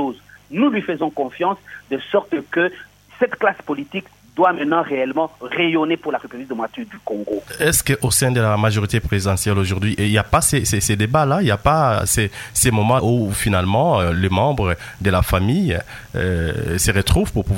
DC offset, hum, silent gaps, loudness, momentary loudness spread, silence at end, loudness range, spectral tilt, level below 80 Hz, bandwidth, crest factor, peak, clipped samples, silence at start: under 0.1%; none; none; -19 LUFS; 11 LU; 0 s; 5 LU; -4.5 dB/octave; -34 dBFS; 16.5 kHz; 18 dB; 0 dBFS; under 0.1%; 0 s